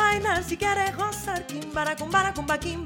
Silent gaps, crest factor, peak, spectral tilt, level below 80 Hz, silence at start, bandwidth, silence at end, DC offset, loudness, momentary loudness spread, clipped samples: none; 18 dB; -8 dBFS; -3.5 dB/octave; -46 dBFS; 0 s; 17.5 kHz; 0 s; under 0.1%; -26 LUFS; 7 LU; under 0.1%